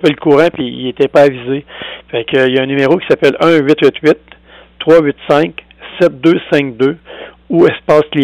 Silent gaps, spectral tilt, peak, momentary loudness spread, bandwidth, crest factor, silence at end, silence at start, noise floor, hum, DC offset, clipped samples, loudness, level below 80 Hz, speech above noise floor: none; -6.5 dB/octave; 0 dBFS; 11 LU; 11.5 kHz; 10 dB; 0 s; 0 s; -31 dBFS; none; under 0.1%; under 0.1%; -12 LUFS; -48 dBFS; 20 dB